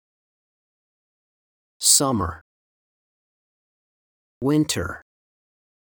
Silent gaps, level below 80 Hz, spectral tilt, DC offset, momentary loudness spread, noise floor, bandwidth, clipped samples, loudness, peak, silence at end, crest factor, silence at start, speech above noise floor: 2.41-4.41 s; -54 dBFS; -3 dB/octave; under 0.1%; 16 LU; under -90 dBFS; over 20 kHz; under 0.1%; -20 LUFS; -2 dBFS; 0.95 s; 24 dB; 1.8 s; over 70 dB